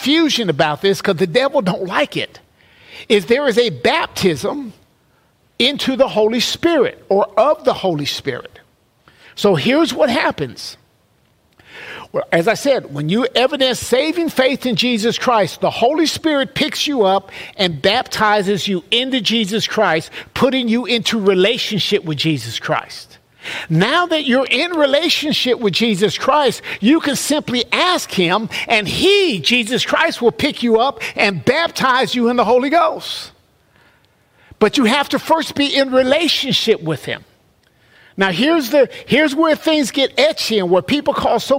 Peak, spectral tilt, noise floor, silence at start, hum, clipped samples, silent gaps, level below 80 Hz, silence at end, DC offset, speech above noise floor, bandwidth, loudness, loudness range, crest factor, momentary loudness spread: -2 dBFS; -4 dB/octave; -57 dBFS; 0 s; none; under 0.1%; none; -52 dBFS; 0 s; under 0.1%; 41 dB; 16 kHz; -16 LUFS; 3 LU; 16 dB; 8 LU